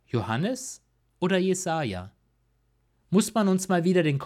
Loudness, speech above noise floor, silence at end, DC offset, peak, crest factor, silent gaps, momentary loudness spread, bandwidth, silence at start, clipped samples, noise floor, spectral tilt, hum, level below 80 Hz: -26 LUFS; 44 dB; 0 s; under 0.1%; -10 dBFS; 16 dB; none; 12 LU; 15 kHz; 0.15 s; under 0.1%; -68 dBFS; -5.5 dB/octave; none; -64 dBFS